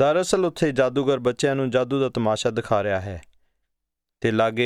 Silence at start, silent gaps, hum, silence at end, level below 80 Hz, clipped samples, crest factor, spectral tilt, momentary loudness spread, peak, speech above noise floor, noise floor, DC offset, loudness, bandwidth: 0 s; none; none; 0 s; -54 dBFS; under 0.1%; 16 dB; -5.5 dB/octave; 6 LU; -6 dBFS; 59 dB; -81 dBFS; under 0.1%; -23 LUFS; 14 kHz